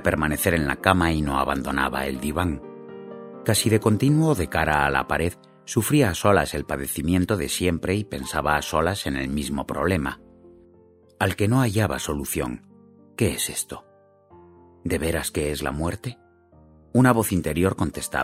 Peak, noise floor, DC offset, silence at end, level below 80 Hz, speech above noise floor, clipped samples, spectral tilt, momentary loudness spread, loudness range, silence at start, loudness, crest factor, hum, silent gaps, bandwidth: 0 dBFS; -54 dBFS; under 0.1%; 0 s; -40 dBFS; 32 dB; under 0.1%; -5 dB/octave; 12 LU; 7 LU; 0 s; -23 LUFS; 24 dB; none; none; 16 kHz